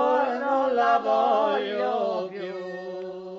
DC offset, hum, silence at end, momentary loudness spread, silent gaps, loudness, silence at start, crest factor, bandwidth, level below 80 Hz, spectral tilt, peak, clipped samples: under 0.1%; none; 0 s; 13 LU; none; -25 LUFS; 0 s; 16 dB; 7.4 kHz; -72 dBFS; -5.5 dB/octave; -10 dBFS; under 0.1%